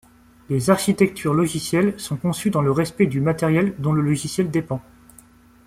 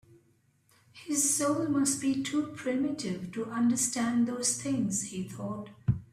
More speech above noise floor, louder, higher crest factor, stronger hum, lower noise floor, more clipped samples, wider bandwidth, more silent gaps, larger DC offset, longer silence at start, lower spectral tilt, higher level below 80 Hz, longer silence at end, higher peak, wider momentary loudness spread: second, 30 dB vs 38 dB; first, -21 LUFS vs -30 LUFS; about the same, 18 dB vs 18 dB; neither; second, -50 dBFS vs -68 dBFS; neither; about the same, 16 kHz vs 15 kHz; neither; neither; second, 0.5 s vs 0.95 s; first, -6 dB/octave vs -4 dB/octave; first, -52 dBFS vs -58 dBFS; first, 0.85 s vs 0.05 s; first, -2 dBFS vs -14 dBFS; second, 6 LU vs 11 LU